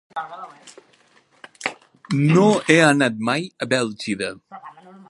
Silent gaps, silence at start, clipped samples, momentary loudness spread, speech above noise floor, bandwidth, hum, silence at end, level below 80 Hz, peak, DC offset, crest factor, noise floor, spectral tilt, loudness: none; 0.15 s; under 0.1%; 24 LU; 28 dB; 11.5 kHz; none; 0.4 s; -64 dBFS; 0 dBFS; under 0.1%; 22 dB; -48 dBFS; -5.5 dB/octave; -19 LUFS